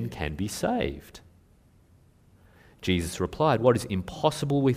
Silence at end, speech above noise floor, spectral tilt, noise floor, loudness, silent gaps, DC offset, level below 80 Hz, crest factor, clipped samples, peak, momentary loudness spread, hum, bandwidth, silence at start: 0 s; 33 dB; -6 dB/octave; -59 dBFS; -27 LUFS; none; under 0.1%; -48 dBFS; 22 dB; under 0.1%; -6 dBFS; 10 LU; none; 15.5 kHz; 0 s